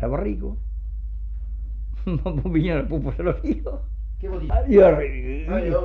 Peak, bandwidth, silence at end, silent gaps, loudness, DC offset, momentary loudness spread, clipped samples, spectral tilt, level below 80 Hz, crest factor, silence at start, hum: -4 dBFS; 4.3 kHz; 0 s; none; -23 LUFS; under 0.1%; 17 LU; under 0.1%; -10 dB/octave; -28 dBFS; 18 dB; 0 s; none